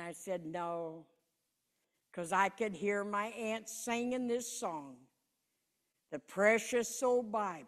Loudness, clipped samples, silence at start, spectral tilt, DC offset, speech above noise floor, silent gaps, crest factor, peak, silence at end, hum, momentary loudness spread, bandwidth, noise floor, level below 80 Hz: -36 LUFS; under 0.1%; 0 s; -3.5 dB/octave; under 0.1%; 48 dB; none; 22 dB; -16 dBFS; 0 s; none; 15 LU; 14.5 kHz; -84 dBFS; -80 dBFS